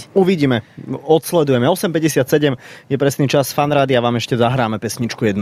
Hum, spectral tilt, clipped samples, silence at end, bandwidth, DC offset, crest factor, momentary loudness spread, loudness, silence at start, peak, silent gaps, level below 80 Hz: none; -5.5 dB/octave; under 0.1%; 0 s; 16 kHz; under 0.1%; 14 dB; 7 LU; -16 LUFS; 0 s; -2 dBFS; none; -52 dBFS